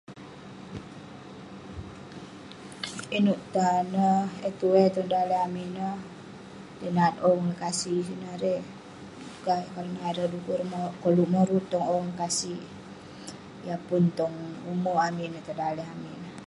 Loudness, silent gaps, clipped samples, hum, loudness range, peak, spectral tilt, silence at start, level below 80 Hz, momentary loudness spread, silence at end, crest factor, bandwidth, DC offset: -28 LUFS; none; under 0.1%; none; 5 LU; -8 dBFS; -5.5 dB/octave; 0.1 s; -62 dBFS; 20 LU; 0 s; 20 dB; 11.5 kHz; under 0.1%